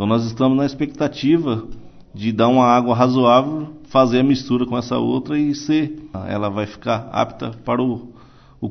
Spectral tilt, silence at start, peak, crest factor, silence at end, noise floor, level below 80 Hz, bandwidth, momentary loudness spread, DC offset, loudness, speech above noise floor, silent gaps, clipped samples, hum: -7 dB/octave; 0 s; -2 dBFS; 16 dB; 0 s; -40 dBFS; -48 dBFS; 6.4 kHz; 12 LU; under 0.1%; -18 LUFS; 22 dB; none; under 0.1%; none